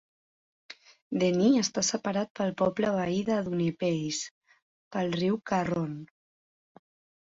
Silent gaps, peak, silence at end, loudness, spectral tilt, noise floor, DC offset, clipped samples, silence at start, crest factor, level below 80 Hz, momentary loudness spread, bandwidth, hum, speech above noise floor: 1.02-1.11 s, 2.30-2.35 s, 4.31-4.41 s, 4.62-4.91 s; -12 dBFS; 1.15 s; -29 LUFS; -5 dB/octave; under -90 dBFS; under 0.1%; under 0.1%; 0.7 s; 18 dB; -66 dBFS; 16 LU; 8 kHz; none; over 62 dB